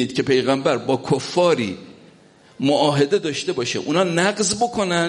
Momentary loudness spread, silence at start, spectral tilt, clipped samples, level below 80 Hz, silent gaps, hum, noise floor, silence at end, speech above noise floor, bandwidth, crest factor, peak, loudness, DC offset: 6 LU; 0 s; -4.5 dB/octave; under 0.1%; -58 dBFS; none; none; -50 dBFS; 0 s; 31 dB; 11.5 kHz; 16 dB; -4 dBFS; -20 LUFS; under 0.1%